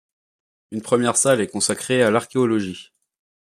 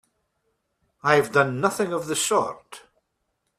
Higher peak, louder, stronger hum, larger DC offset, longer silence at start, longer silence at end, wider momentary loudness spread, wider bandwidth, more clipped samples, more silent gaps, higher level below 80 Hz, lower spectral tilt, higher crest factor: about the same, -4 dBFS vs -2 dBFS; first, -19 LUFS vs -23 LUFS; neither; neither; second, 0.7 s vs 1.05 s; second, 0.6 s vs 0.8 s; first, 15 LU vs 10 LU; about the same, 15 kHz vs 15 kHz; neither; neither; about the same, -64 dBFS vs -66 dBFS; about the same, -4 dB/octave vs -3.5 dB/octave; second, 18 dB vs 24 dB